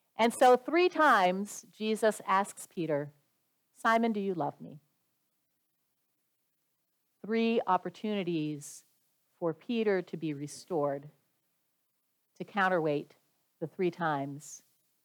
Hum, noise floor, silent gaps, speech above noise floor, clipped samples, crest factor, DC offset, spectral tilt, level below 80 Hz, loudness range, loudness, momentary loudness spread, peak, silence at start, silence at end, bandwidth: none; -79 dBFS; none; 49 dB; under 0.1%; 20 dB; under 0.1%; -5 dB/octave; -86 dBFS; 6 LU; -30 LUFS; 18 LU; -12 dBFS; 0.2 s; 0.45 s; 20 kHz